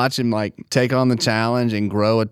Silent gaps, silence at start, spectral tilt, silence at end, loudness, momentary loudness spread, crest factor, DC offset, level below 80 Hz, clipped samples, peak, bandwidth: none; 0 s; -5.5 dB/octave; 0 s; -19 LUFS; 4 LU; 16 dB; under 0.1%; -60 dBFS; under 0.1%; -4 dBFS; 15.5 kHz